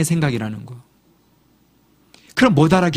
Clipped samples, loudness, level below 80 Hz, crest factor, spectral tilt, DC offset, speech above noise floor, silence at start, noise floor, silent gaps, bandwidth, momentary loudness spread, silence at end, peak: under 0.1%; -17 LUFS; -48 dBFS; 18 dB; -6 dB/octave; under 0.1%; 41 dB; 0 s; -57 dBFS; none; 15.5 kHz; 19 LU; 0 s; 0 dBFS